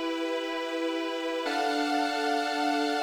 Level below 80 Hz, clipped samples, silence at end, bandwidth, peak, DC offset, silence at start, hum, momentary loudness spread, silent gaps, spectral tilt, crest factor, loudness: -78 dBFS; under 0.1%; 0 s; 19.5 kHz; -16 dBFS; under 0.1%; 0 s; none; 4 LU; none; -1 dB/octave; 12 dB; -29 LUFS